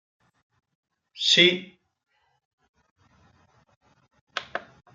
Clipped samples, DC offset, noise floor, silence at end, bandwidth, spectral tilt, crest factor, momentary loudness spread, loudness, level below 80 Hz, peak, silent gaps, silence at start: under 0.1%; under 0.1%; -62 dBFS; 0.35 s; 9.4 kHz; -2.5 dB/octave; 26 dB; 20 LU; -20 LUFS; -74 dBFS; -4 dBFS; 2.45-2.58 s, 2.69-2.74 s, 2.91-2.96 s, 3.76-3.81 s, 4.21-4.27 s; 1.15 s